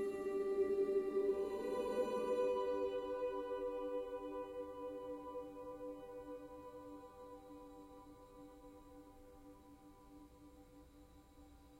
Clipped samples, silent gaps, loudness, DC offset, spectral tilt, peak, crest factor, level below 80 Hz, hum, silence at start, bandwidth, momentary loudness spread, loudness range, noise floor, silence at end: under 0.1%; none; -42 LUFS; under 0.1%; -6 dB/octave; -28 dBFS; 16 dB; -68 dBFS; none; 0 s; 15.5 kHz; 24 LU; 21 LU; -63 dBFS; 0 s